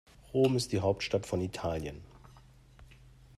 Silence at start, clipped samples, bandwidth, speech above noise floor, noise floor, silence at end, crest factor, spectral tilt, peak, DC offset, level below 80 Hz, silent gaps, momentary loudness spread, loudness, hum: 0.3 s; under 0.1%; 14 kHz; 26 dB; -57 dBFS; 0.45 s; 18 dB; -5.5 dB/octave; -16 dBFS; under 0.1%; -56 dBFS; none; 11 LU; -32 LUFS; none